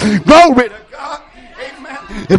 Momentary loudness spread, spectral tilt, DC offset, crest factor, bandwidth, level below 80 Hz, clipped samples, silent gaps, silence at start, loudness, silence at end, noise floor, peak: 24 LU; -5.5 dB/octave; under 0.1%; 12 dB; 11.5 kHz; -38 dBFS; 0.3%; none; 0 s; -8 LUFS; 0 s; -32 dBFS; 0 dBFS